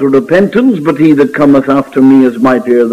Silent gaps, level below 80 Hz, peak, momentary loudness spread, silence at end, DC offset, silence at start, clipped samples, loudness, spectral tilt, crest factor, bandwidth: none; -48 dBFS; 0 dBFS; 4 LU; 0 s; under 0.1%; 0 s; 0.3%; -8 LUFS; -8 dB/octave; 8 dB; 10 kHz